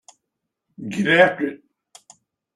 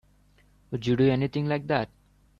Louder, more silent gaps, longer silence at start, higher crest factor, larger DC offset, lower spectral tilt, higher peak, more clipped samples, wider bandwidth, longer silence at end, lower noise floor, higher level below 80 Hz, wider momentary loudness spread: first, -19 LUFS vs -26 LUFS; neither; about the same, 0.8 s vs 0.7 s; about the same, 22 dB vs 18 dB; neither; second, -5.5 dB/octave vs -8 dB/octave; first, -2 dBFS vs -10 dBFS; neither; first, 12 kHz vs 7.2 kHz; first, 1 s vs 0.55 s; first, -80 dBFS vs -61 dBFS; second, -66 dBFS vs -56 dBFS; first, 16 LU vs 12 LU